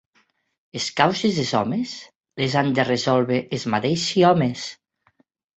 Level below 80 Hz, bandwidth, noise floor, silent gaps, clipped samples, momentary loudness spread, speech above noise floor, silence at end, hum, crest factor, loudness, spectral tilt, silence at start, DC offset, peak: -60 dBFS; 8.2 kHz; -65 dBFS; 2.15-2.21 s; under 0.1%; 15 LU; 44 dB; 0.85 s; none; 22 dB; -21 LUFS; -5 dB/octave; 0.75 s; under 0.1%; -2 dBFS